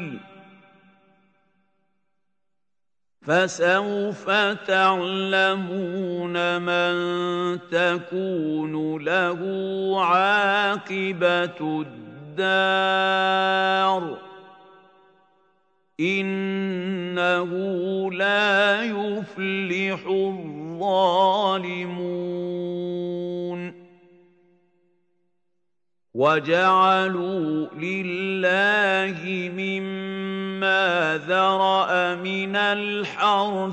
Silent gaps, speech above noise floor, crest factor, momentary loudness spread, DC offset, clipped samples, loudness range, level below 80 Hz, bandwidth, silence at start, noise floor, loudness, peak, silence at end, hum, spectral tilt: none; 66 dB; 18 dB; 10 LU; under 0.1%; under 0.1%; 6 LU; -78 dBFS; 8.8 kHz; 0 s; -88 dBFS; -22 LUFS; -6 dBFS; 0 s; none; -5 dB/octave